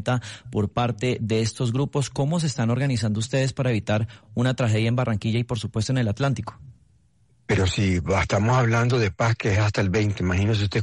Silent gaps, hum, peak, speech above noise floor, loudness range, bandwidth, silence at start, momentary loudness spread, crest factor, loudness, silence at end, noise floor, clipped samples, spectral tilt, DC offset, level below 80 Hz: none; none; -12 dBFS; 39 dB; 3 LU; 11.5 kHz; 0 s; 5 LU; 12 dB; -23 LUFS; 0 s; -61 dBFS; under 0.1%; -6 dB/octave; under 0.1%; -48 dBFS